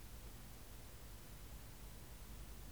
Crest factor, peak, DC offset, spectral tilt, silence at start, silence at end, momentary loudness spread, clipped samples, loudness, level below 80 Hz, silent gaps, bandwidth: 12 dB; -42 dBFS; 0.1%; -4 dB/octave; 0 s; 0 s; 1 LU; under 0.1%; -56 LUFS; -58 dBFS; none; over 20 kHz